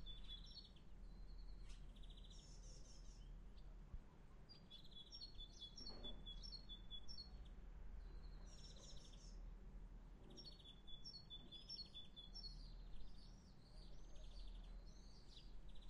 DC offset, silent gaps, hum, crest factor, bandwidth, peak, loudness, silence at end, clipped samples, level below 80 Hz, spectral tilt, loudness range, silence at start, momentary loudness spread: under 0.1%; none; none; 16 dB; 11 kHz; -42 dBFS; -60 LUFS; 0 s; under 0.1%; -60 dBFS; -4 dB/octave; 6 LU; 0 s; 9 LU